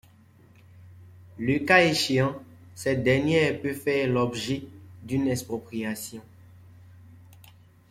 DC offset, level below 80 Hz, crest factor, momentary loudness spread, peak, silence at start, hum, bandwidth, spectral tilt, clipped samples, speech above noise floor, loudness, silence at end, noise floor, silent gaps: under 0.1%; -58 dBFS; 24 dB; 20 LU; -4 dBFS; 0.75 s; none; 16 kHz; -5 dB/octave; under 0.1%; 30 dB; -25 LUFS; 0.8 s; -55 dBFS; none